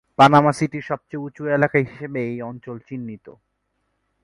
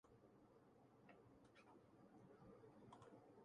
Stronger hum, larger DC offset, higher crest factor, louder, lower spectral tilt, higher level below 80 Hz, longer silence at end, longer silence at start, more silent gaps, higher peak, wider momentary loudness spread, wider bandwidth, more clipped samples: neither; neither; about the same, 20 dB vs 16 dB; first, -19 LUFS vs -68 LUFS; about the same, -6.5 dB/octave vs -6.5 dB/octave; first, -60 dBFS vs -88 dBFS; first, 0.95 s vs 0 s; first, 0.2 s vs 0.05 s; neither; first, 0 dBFS vs -52 dBFS; first, 20 LU vs 4 LU; first, 11.5 kHz vs 10 kHz; neither